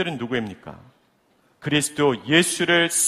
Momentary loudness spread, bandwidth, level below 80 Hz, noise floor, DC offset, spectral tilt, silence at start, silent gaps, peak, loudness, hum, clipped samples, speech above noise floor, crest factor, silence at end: 17 LU; 15.5 kHz; -58 dBFS; -62 dBFS; under 0.1%; -3 dB/octave; 0 s; none; -4 dBFS; -20 LUFS; none; under 0.1%; 41 dB; 20 dB; 0 s